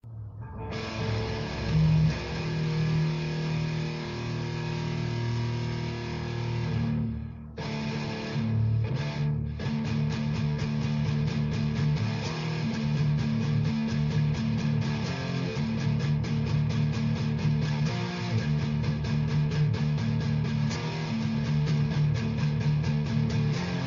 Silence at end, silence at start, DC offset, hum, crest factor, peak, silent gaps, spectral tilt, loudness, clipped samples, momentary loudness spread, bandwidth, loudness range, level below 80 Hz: 0 s; 0.05 s; under 0.1%; none; 14 dB; -14 dBFS; none; -7 dB/octave; -29 LUFS; under 0.1%; 6 LU; 7.2 kHz; 3 LU; -44 dBFS